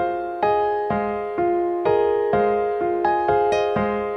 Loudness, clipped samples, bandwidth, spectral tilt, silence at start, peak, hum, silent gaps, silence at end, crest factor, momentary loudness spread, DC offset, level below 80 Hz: -21 LUFS; under 0.1%; 6.2 kHz; -7 dB/octave; 0 s; -8 dBFS; none; none; 0 s; 14 dB; 4 LU; under 0.1%; -50 dBFS